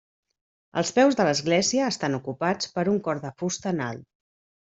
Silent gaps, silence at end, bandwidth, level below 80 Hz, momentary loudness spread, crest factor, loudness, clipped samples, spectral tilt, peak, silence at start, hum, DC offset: none; 0.65 s; 8.2 kHz; -66 dBFS; 10 LU; 18 dB; -25 LUFS; under 0.1%; -4 dB/octave; -8 dBFS; 0.75 s; none; under 0.1%